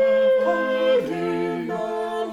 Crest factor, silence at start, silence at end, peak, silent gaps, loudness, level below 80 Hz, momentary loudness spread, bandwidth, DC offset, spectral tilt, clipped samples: 12 dB; 0 s; 0 s; -10 dBFS; none; -22 LUFS; -66 dBFS; 8 LU; 10 kHz; under 0.1%; -6 dB/octave; under 0.1%